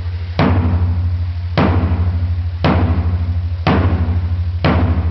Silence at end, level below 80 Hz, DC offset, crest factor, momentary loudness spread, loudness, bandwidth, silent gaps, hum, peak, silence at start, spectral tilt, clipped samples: 0 s; -22 dBFS; 0.3%; 14 dB; 5 LU; -17 LUFS; 5.8 kHz; none; none; -2 dBFS; 0 s; -9.5 dB/octave; under 0.1%